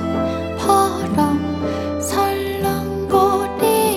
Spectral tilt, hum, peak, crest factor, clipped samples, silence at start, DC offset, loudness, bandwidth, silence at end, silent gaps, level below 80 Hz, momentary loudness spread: -5 dB/octave; none; -2 dBFS; 16 dB; under 0.1%; 0 s; under 0.1%; -19 LUFS; 19 kHz; 0 s; none; -40 dBFS; 7 LU